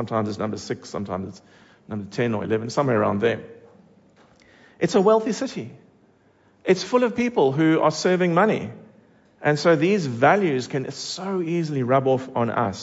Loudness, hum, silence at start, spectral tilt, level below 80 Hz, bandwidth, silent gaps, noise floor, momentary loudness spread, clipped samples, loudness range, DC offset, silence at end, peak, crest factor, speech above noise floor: -22 LUFS; none; 0 s; -6 dB/octave; -64 dBFS; 8 kHz; none; -58 dBFS; 13 LU; under 0.1%; 5 LU; under 0.1%; 0 s; -6 dBFS; 18 dB; 37 dB